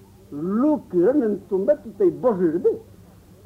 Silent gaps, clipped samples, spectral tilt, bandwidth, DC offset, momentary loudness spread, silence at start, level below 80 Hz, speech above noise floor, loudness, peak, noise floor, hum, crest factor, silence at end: none; under 0.1%; -10 dB/octave; 6.4 kHz; under 0.1%; 8 LU; 0.3 s; -58 dBFS; 27 dB; -21 LUFS; -8 dBFS; -48 dBFS; none; 14 dB; 0.65 s